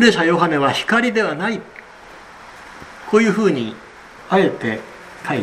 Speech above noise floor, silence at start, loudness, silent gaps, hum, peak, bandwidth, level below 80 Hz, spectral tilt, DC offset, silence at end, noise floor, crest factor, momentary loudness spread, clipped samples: 24 dB; 0 s; -18 LUFS; none; none; 0 dBFS; 13 kHz; -56 dBFS; -5 dB/octave; under 0.1%; 0 s; -40 dBFS; 18 dB; 23 LU; under 0.1%